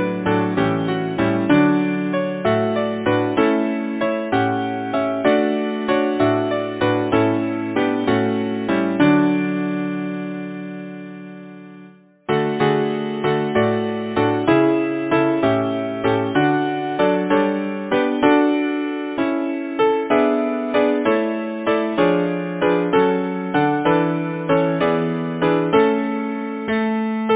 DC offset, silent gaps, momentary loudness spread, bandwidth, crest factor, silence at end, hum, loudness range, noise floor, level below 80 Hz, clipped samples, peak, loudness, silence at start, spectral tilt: under 0.1%; none; 7 LU; 4 kHz; 18 dB; 0 s; none; 3 LU; -45 dBFS; -54 dBFS; under 0.1%; 0 dBFS; -19 LUFS; 0 s; -10.5 dB/octave